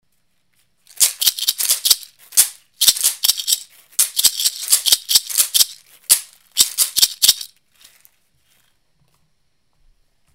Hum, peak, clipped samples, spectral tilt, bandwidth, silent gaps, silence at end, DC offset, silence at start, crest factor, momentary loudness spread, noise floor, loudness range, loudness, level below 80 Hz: none; 0 dBFS; under 0.1%; 4 dB/octave; over 20 kHz; none; 2.9 s; under 0.1%; 1 s; 20 dB; 6 LU; -68 dBFS; 4 LU; -15 LUFS; -60 dBFS